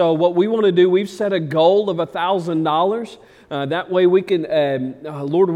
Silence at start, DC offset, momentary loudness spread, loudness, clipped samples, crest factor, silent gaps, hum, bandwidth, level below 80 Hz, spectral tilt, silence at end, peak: 0 s; under 0.1%; 11 LU; -18 LUFS; under 0.1%; 14 dB; none; none; 9.8 kHz; -64 dBFS; -7 dB/octave; 0 s; -4 dBFS